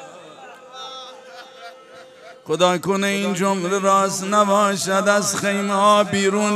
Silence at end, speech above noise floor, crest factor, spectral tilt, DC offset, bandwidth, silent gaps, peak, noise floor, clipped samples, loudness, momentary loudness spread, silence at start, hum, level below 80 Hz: 0 s; 25 dB; 18 dB; -4 dB/octave; under 0.1%; 14.5 kHz; none; -2 dBFS; -43 dBFS; under 0.1%; -18 LUFS; 23 LU; 0 s; none; -70 dBFS